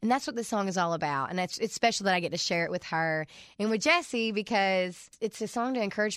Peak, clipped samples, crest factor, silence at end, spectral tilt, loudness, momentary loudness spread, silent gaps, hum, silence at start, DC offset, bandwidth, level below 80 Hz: -12 dBFS; under 0.1%; 18 dB; 0 s; -4 dB/octave; -29 LUFS; 8 LU; none; none; 0 s; under 0.1%; 15 kHz; -70 dBFS